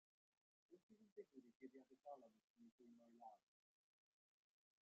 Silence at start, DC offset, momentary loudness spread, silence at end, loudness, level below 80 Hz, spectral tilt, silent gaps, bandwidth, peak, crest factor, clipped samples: 0.7 s; under 0.1%; 4 LU; 1.45 s; -65 LUFS; under -90 dBFS; -5.5 dB/octave; 0.83-0.89 s, 1.12-1.16 s, 1.55-1.60 s, 2.44-2.54 s, 2.72-2.79 s; 7 kHz; -48 dBFS; 20 dB; under 0.1%